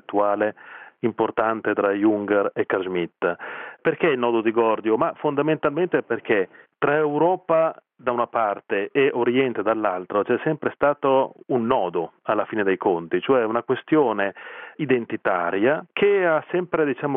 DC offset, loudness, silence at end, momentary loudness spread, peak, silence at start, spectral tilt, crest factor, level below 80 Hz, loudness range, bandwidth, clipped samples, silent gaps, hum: under 0.1%; -22 LUFS; 0 s; 6 LU; -4 dBFS; 0.1 s; -10 dB/octave; 18 dB; -66 dBFS; 1 LU; 3.8 kHz; under 0.1%; none; none